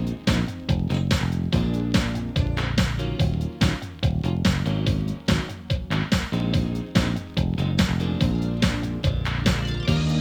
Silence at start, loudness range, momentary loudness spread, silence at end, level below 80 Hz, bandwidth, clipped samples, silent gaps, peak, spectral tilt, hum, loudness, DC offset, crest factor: 0 s; 1 LU; 3 LU; 0 s; -32 dBFS; 19.5 kHz; under 0.1%; none; -6 dBFS; -6 dB/octave; none; -24 LUFS; under 0.1%; 18 dB